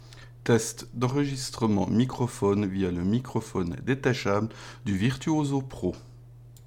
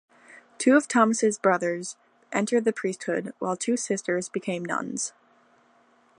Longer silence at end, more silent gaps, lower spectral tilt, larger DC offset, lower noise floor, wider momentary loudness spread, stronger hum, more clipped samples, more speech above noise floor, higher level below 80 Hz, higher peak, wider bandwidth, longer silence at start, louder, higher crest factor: second, 0 s vs 1.1 s; neither; first, -6 dB/octave vs -4 dB/octave; neither; second, -48 dBFS vs -61 dBFS; about the same, 8 LU vs 10 LU; neither; neither; second, 22 dB vs 36 dB; first, -52 dBFS vs -78 dBFS; second, -10 dBFS vs -6 dBFS; first, 16.5 kHz vs 11.5 kHz; second, 0 s vs 0.3 s; about the same, -28 LUFS vs -26 LUFS; about the same, 18 dB vs 20 dB